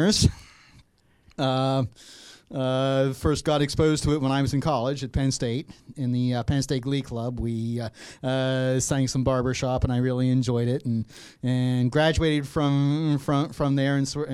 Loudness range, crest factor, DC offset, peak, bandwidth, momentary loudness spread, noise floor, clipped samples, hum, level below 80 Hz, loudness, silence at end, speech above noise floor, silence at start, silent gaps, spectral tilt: 3 LU; 20 dB; under 0.1%; -6 dBFS; 13 kHz; 9 LU; -59 dBFS; under 0.1%; none; -42 dBFS; -25 LUFS; 0 s; 35 dB; 0 s; none; -6 dB/octave